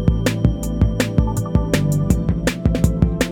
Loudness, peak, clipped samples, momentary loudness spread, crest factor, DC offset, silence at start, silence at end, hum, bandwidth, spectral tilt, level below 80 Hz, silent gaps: -19 LUFS; -2 dBFS; under 0.1%; 2 LU; 16 dB; under 0.1%; 0 s; 0 s; none; 18.5 kHz; -6.5 dB/octave; -24 dBFS; none